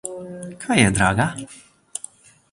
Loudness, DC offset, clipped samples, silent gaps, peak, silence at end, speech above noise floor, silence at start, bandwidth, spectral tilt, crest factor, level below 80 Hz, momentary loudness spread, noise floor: -19 LUFS; under 0.1%; under 0.1%; none; -2 dBFS; 0.55 s; 24 dB; 0.05 s; 11.5 kHz; -4.5 dB/octave; 20 dB; -44 dBFS; 19 LU; -44 dBFS